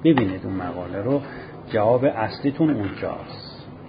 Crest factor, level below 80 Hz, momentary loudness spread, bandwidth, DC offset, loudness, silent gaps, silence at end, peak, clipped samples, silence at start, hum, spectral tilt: 18 dB; -50 dBFS; 17 LU; 5.2 kHz; under 0.1%; -23 LUFS; none; 0 s; -4 dBFS; under 0.1%; 0 s; none; -12 dB/octave